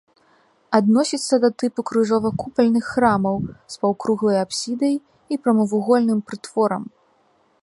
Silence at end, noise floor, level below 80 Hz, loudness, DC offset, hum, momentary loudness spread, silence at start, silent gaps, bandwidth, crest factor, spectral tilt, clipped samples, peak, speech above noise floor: 0.75 s; -61 dBFS; -56 dBFS; -20 LUFS; under 0.1%; none; 8 LU; 0.7 s; none; 11.5 kHz; 20 dB; -5.5 dB/octave; under 0.1%; 0 dBFS; 41 dB